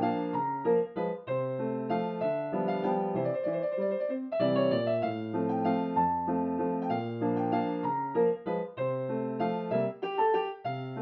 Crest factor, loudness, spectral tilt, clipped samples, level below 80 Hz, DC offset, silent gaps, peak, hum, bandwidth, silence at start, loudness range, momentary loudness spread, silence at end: 16 dB; -31 LUFS; -6.5 dB/octave; under 0.1%; -70 dBFS; under 0.1%; none; -14 dBFS; none; 5.4 kHz; 0 s; 1 LU; 5 LU; 0 s